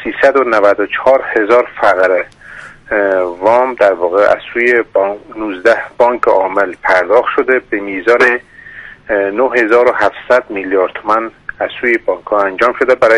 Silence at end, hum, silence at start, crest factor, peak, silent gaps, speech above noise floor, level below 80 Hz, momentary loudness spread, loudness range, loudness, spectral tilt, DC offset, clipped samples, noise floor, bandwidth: 0 s; none; 0 s; 12 dB; 0 dBFS; none; 22 dB; -48 dBFS; 9 LU; 1 LU; -12 LUFS; -5 dB/octave; under 0.1%; 0.1%; -34 dBFS; 10.5 kHz